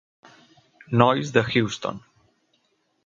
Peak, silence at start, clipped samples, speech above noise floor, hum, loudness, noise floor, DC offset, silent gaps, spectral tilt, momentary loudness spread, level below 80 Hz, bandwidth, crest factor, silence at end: 0 dBFS; 0.9 s; under 0.1%; 48 dB; none; -22 LUFS; -69 dBFS; under 0.1%; none; -6 dB/octave; 13 LU; -58 dBFS; 7.6 kHz; 24 dB; 1.1 s